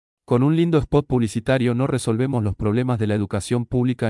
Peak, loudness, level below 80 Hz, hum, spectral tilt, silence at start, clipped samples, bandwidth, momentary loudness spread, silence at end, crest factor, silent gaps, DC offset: -6 dBFS; -21 LUFS; -42 dBFS; none; -7 dB/octave; 0.3 s; under 0.1%; 12 kHz; 5 LU; 0 s; 14 dB; none; under 0.1%